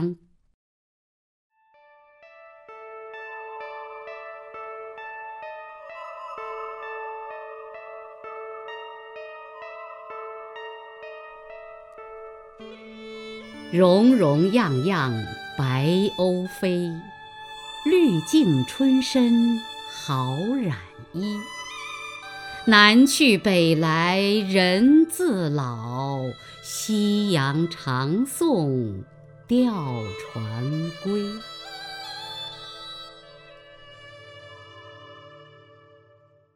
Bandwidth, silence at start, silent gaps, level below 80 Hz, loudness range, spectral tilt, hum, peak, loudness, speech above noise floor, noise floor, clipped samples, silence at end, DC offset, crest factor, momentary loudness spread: 16 kHz; 0 s; 0.54-1.50 s; -62 dBFS; 20 LU; -5.5 dB/octave; none; 0 dBFS; -22 LUFS; 37 dB; -58 dBFS; under 0.1%; 1.2 s; under 0.1%; 24 dB; 23 LU